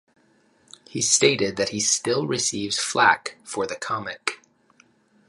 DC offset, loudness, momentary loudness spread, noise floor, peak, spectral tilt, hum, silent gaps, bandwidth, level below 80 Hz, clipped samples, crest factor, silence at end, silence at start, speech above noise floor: under 0.1%; -22 LUFS; 12 LU; -61 dBFS; -4 dBFS; -2 dB/octave; none; none; 11.5 kHz; -64 dBFS; under 0.1%; 22 dB; 0.95 s; 0.9 s; 38 dB